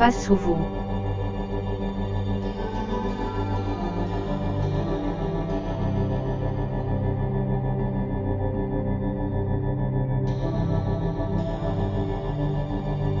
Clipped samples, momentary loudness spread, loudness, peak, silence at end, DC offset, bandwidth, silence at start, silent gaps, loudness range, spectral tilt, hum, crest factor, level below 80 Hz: under 0.1%; 3 LU; -27 LUFS; -4 dBFS; 0 s; under 0.1%; 7.6 kHz; 0 s; none; 2 LU; -8 dB/octave; none; 20 dB; -32 dBFS